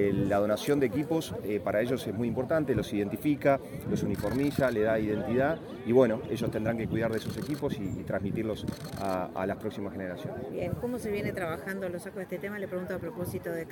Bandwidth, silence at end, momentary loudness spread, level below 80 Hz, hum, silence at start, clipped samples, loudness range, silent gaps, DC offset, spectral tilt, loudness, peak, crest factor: 17 kHz; 0 s; 9 LU; -54 dBFS; none; 0 s; under 0.1%; 6 LU; none; under 0.1%; -7 dB/octave; -31 LUFS; -10 dBFS; 20 dB